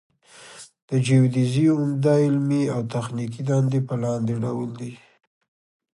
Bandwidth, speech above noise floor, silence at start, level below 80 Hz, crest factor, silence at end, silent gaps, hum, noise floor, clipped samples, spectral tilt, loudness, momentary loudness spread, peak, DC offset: 11.5 kHz; 25 dB; 0.4 s; -62 dBFS; 16 dB; 1 s; 0.82-0.88 s; none; -47 dBFS; under 0.1%; -7.5 dB/octave; -22 LUFS; 13 LU; -8 dBFS; under 0.1%